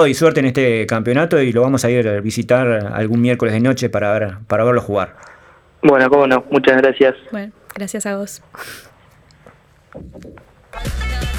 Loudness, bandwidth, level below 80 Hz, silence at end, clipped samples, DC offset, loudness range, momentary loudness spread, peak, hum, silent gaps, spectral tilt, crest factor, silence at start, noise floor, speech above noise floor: -15 LUFS; 18 kHz; -36 dBFS; 0 s; under 0.1%; under 0.1%; 15 LU; 17 LU; -2 dBFS; none; none; -6 dB/octave; 14 dB; 0 s; -48 dBFS; 33 dB